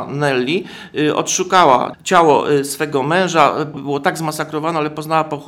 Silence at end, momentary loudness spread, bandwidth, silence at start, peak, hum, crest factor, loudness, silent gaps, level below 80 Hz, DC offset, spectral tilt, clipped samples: 0 s; 10 LU; 17 kHz; 0 s; 0 dBFS; none; 16 dB; -16 LUFS; none; -58 dBFS; under 0.1%; -4 dB/octave; under 0.1%